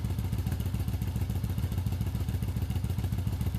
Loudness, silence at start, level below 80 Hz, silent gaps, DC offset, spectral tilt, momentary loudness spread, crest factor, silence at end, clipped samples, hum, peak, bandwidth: -32 LUFS; 0 s; -38 dBFS; none; under 0.1%; -7 dB/octave; 1 LU; 12 dB; 0 s; under 0.1%; none; -18 dBFS; 15.5 kHz